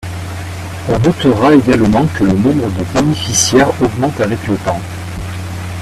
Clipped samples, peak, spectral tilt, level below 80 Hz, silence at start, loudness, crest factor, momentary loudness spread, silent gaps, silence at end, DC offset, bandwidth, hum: under 0.1%; 0 dBFS; -5 dB/octave; -34 dBFS; 0 s; -13 LUFS; 14 dB; 15 LU; none; 0 s; under 0.1%; 14.5 kHz; none